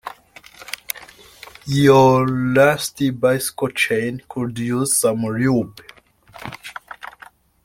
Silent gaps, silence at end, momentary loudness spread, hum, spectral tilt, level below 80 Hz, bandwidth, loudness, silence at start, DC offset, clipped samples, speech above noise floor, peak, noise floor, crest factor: none; 0.6 s; 22 LU; none; -5 dB/octave; -52 dBFS; 16.5 kHz; -18 LUFS; 0.05 s; under 0.1%; under 0.1%; 29 dB; 0 dBFS; -47 dBFS; 20 dB